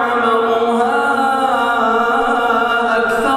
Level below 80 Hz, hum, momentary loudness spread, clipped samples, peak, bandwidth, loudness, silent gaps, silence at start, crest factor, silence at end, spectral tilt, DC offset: -48 dBFS; none; 1 LU; under 0.1%; -2 dBFS; 14.5 kHz; -14 LUFS; none; 0 s; 12 dB; 0 s; -4 dB/octave; under 0.1%